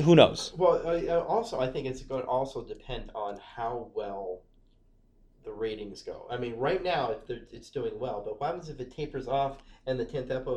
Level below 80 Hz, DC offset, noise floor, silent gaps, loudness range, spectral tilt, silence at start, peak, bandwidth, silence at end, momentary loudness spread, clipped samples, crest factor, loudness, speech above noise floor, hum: -52 dBFS; under 0.1%; -62 dBFS; none; 8 LU; -6 dB/octave; 0 s; -4 dBFS; 10.5 kHz; 0 s; 15 LU; under 0.1%; 26 dB; -31 LUFS; 32 dB; none